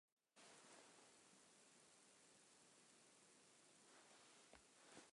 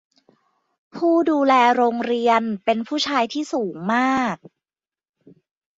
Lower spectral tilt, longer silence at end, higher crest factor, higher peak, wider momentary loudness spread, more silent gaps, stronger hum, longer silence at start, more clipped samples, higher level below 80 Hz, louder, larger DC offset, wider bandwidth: second, -1.5 dB/octave vs -4.5 dB/octave; second, 0 s vs 1.45 s; about the same, 22 dB vs 18 dB; second, -48 dBFS vs -4 dBFS; second, 4 LU vs 10 LU; neither; neither; second, 0.2 s vs 0.95 s; neither; second, under -90 dBFS vs -68 dBFS; second, -68 LUFS vs -20 LUFS; neither; first, 11.5 kHz vs 7.8 kHz